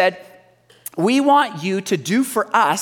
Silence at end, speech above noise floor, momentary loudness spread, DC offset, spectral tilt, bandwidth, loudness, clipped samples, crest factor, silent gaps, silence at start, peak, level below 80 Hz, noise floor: 0 s; 34 dB; 9 LU; under 0.1%; -4.5 dB/octave; 18 kHz; -18 LUFS; under 0.1%; 16 dB; none; 0 s; -4 dBFS; -70 dBFS; -52 dBFS